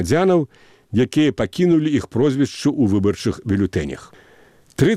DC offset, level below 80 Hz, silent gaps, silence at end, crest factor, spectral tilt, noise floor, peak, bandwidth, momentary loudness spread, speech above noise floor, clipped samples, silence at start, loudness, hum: 0.1%; -46 dBFS; none; 0 s; 16 dB; -6.5 dB/octave; -50 dBFS; -2 dBFS; 14 kHz; 9 LU; 32 dB; under 0.1%; 0 s; -19 LUFS; none